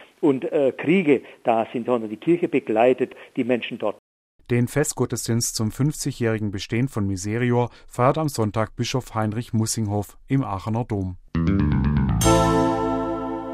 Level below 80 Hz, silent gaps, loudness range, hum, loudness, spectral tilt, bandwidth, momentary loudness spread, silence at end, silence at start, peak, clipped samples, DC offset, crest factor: -38 dBFS; 3.99-4.39 s; 3 LU; none; -23 LUFS; -6 dB/octave; 16 kHz; 8 LU; 0 s; 0 s; -4 dBFS; under 0.1%; under 0.1%; 18 dB